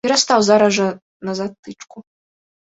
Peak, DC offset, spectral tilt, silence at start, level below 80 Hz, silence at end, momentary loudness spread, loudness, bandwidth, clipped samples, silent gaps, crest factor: -2 dBFS; under 0.1%; -3.5 dB/octave; 0.05 s; -62 dBFS; 0.6 s; 23 LU; -16 LUFS; 8.4 kHz; under 0.1%; 1.02-1.20 s, 1.59-1.63 s; 18 dB